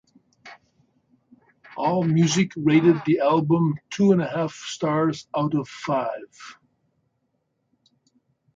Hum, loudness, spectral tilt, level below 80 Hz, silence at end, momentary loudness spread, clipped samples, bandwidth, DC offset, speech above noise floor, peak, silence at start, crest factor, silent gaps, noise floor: none; -22 LUFS; -6.5 dB/octave; -64 dBFS; 2.05 s; 12 LU; under 0.1%; 9 kHz; under 0.1%; 52 dB; -6 dBFS; 0.45 s; 18 dB; none; -73 dBFS